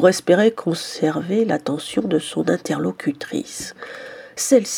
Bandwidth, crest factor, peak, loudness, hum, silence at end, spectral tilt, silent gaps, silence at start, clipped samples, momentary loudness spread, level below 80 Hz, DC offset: 18 kHz; 18 dB; -2 dBFS; -21 LUFS; none; 0 s; -4.5 dB/octave; none; 0 s; under 0.1%; 15 LU; -64 dBFS; under 0.1%